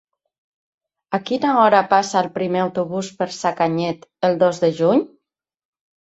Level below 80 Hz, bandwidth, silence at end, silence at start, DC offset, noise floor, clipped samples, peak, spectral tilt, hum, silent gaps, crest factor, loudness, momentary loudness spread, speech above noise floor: -66 dBFS; 8.2 kHz; 1.05 s; 1.1 s; under 0.1%; -75 dBFS; under 0.1%; -2 dBFS; -5.5 dB/octave; none; none; 18 dB; -19 LUFS; 11 LU; 57 dB